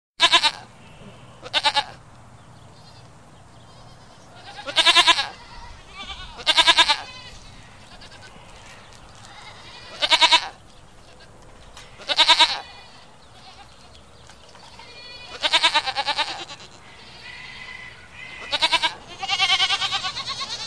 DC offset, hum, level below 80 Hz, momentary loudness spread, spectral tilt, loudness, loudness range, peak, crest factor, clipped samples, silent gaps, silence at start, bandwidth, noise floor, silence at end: 0.3%; none; -52 dBFS; 26 LU; 0 dB/octave; -18 LUFS; 10 LU; -2 dBFS; 24 dB; under 0.1%; none; 0.2 s; 14 kHz; -48 dBFS; 0 s